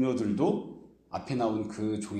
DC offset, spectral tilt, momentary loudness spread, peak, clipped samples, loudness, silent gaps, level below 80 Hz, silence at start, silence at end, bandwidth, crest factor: under 0.1%; -7 dB/octave; 14 LU; -14 dBFS; under 0.1%; -31 LUFS; none; -64 dBFS; 0 s; 0 s; 9.6 kHz; 16 dB